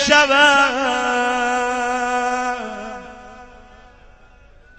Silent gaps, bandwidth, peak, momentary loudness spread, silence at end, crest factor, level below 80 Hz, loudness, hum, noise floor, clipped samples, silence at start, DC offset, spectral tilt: none; 15.5 kHz; 0 dBFS; 20 LU; 1.35 s; 20 dB; -48 dBFS; -17 LUFS; none; -47 dBFS; under 0.1%; 0 s; under 0.1%; -1.5 dB/octave